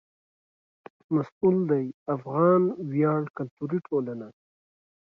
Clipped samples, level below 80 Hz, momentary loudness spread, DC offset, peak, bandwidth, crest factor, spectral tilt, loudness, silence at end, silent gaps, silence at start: under 0.1%; -72 dBFS; 13 LU; under 0.1%; -8 dBFS; 5.2 kHz; 18 dB; -11.5 dB/octave; -26 LUFS; 0.8 s; 1.32-1.41 s, 1.94-2.06 s, 3.30-3.34 s, 3.51-3.57 s; 1.1 s